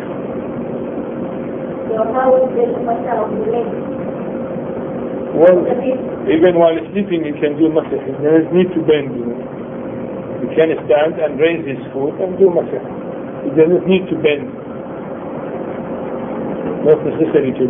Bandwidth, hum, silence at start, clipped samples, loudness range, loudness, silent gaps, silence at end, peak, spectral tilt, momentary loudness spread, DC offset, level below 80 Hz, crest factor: 3.7 kHz; none; 0 s; under 0.1%; 4 LU; -17 LUFS; none; 0 s; 0 dBFS; -10.5 dB/octave; 12 LU; under 0.1%; -50 dBFS; 16 dB